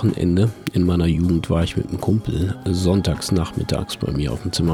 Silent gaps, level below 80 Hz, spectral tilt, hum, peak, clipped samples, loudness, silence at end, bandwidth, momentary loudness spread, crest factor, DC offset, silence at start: none; -34 dBFS; -6.5 dB/octave; none; -6 dBFS; under 0.1%; -21 LUFS; 0 s; 16 kHz; 5 LU; 14 dB; under 0.1%; 0 s